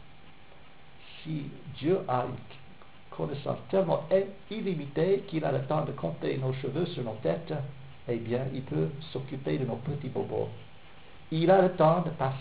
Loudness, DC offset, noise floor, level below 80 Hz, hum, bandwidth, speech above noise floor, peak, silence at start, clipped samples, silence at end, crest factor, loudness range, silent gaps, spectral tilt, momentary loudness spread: -30 LUFS; 0.4%; -55 dBFS; -60 dBFS; none; 4 kHz; 25 dB; -10 dBFS; 0 s; under 0.1%; 0 s; 22 dB; 5 LU; none; -6.5 dB/octave; 14 LU